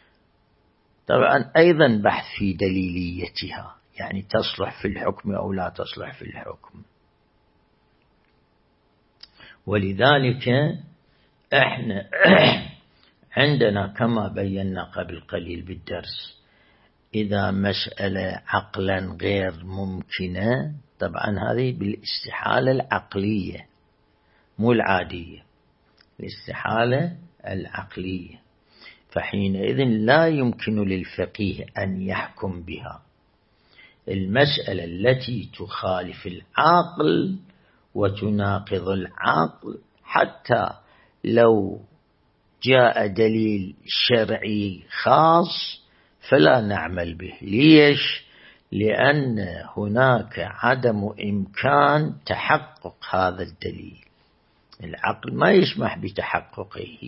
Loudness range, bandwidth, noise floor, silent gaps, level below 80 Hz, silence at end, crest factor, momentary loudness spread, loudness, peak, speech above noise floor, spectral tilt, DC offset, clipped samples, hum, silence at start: 9 LU; 5.8 kHz; -63 dBFS; none; -54 dBFS; 0 s; 22 dB; 17 LU; -22 LUFS; 0 dBFS; 42 dB; -10 dB/octave; under 0.1%; under 0.1%; none; 1.1 s